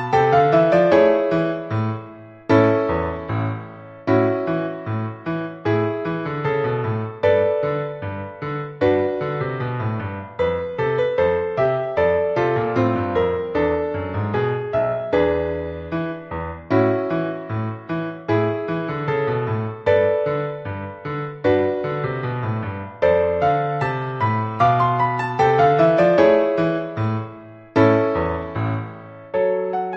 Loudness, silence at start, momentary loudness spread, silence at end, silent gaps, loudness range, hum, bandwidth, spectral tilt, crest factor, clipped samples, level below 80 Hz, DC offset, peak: -20 LUFS; 0 s; 13 LU; 0 s; none; 5 LU; none; 7.6 kHz; -8.5 dB/octave; 16 dB; under 0.1%; -48 dBFS; under 0.1%; -4 dBFS